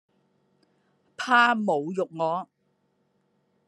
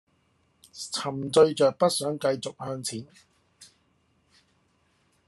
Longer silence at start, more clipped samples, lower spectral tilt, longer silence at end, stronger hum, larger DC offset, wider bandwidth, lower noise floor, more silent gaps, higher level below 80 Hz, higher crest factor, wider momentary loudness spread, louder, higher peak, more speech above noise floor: first, 1.2 s vs 0.75 s; neither; about the same, -4.5 dB/octave vs -4.5 dB/octave; second, 1.25 s vs 1.65 s; neither; neither; about the same, 11.5 kHz vs 12.5 kHz; about the same, -71 dBFS vs -68 dBFS; neither; second, -86 dBFS vs -74 dBFS; about the same, 22 dB vs 22 dB; about the same, 15 LU vs 16 LU; about the same, -24 LUFS vs -26 LUFS; about the same, -6 dBFS vs -6 dBFS; first, 47 dB vs 43 dB